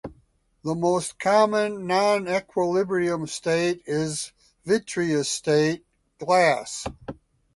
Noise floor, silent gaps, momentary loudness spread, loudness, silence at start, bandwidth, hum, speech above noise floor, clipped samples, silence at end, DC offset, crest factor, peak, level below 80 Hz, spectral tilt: -63 dBFS; none; 16 LU; -24 LUFS; 0.05 s; 11.5 kHz; none; 39 dB; under 0.1%; 0.4 s; under 0.1%; 18 dB; -6 dBFS; -58 dBFS; -4.5 dB/octave